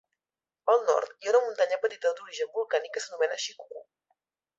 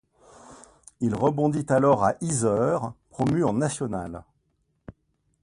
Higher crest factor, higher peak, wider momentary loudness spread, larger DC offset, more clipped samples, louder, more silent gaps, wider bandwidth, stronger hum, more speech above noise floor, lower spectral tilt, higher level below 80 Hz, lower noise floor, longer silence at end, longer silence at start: about the same, 18 dB vs 18 dB; about the same, -10 dBFS vs -8 dBFS; about the same, 12 LU vs 12 LU; neither; neither; second, -28 LUFS vs -24 LUFS; neither; second, 8 kHz vs 11.5 kHz; neither; first, over 62 dB vs 48 dB; second, 1 dB/octave vs -6.5 dB/octave; second, -84 dBFS vs -54 dBFS; first, under -90 dBFS vs -71 dBFS; first, 0.75 s vs 0.5 s; first, 0.65 s vs 0.5 s